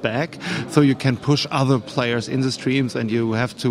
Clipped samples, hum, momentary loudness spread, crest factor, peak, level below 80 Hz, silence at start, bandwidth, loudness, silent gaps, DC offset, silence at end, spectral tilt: under 0.1%; none; 6 LU; 18 dB; -2 dBFS; -56 dBFS; 0 s; 13.5 kHz; -21 LUFS; none; under 0.1%; 0 s; -6 dB/octave